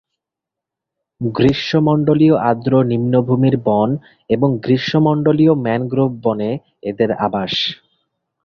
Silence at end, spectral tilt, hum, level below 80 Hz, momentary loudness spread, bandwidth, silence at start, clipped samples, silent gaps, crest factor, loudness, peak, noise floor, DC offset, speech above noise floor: 0.7 s; -8 dB/octave; none; -50 dBFS; 9 LU; 6.8 kHz; 1.2 s; under 0.1%; none; 14 dB; -16 LUFS; -2 dBFS; -84 dBFS; under 0.1%; 69 dB